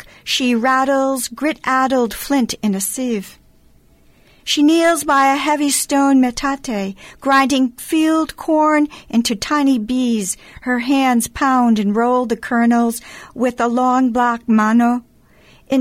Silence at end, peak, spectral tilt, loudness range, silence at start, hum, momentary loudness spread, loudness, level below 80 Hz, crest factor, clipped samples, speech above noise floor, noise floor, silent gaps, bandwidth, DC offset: 0 s; -4 dBFS; -3.5 dB/octave; 3 LU; 0.25 s; none; 8 LU; -16 LUFS; -48 dBFS; 12 dB; under 0.1%; 34 dB; -50 dBFS; none; 16 kHz; under 0.1%